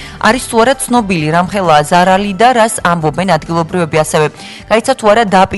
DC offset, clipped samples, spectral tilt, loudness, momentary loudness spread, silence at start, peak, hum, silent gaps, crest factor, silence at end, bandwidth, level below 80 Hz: under 0.1%; 0.4%; -4.5 dB/octave; -11 LUFS; 5 LU; 0 s; 0 dBFS; none; none; 10 dB; 0 s; 12 kHz; -38 dBFS